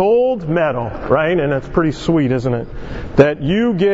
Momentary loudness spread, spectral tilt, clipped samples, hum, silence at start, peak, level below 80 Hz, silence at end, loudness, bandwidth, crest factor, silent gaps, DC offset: 8 LU; -8 dB/octave; under 0.1%; none; 0 s; 0 dBFS; -34 dBFS; 0 s; -16 LUFS; 8 kHz; 16 dB; none; under 0.1%